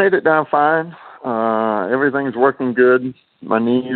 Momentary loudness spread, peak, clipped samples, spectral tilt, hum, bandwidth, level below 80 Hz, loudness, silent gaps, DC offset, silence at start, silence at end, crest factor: 13 LU; -2 dBFS; under 0.1%; -11 dB/octave; none; 4.3 kHz; -68 dBFS; -16 LUFS; none; under 0.1%; 0 s; 0 s; 16 dB